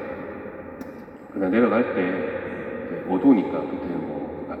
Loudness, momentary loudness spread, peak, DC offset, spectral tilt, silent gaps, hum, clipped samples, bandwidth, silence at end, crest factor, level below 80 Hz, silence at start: -24 LUFS; 18 LU; -6 dBFS; under 0.1%; -9 dB/octave; none; none; under 0.1%; 4.6 kHz; 0 s; 18 dB; -58 dBFS; 0 s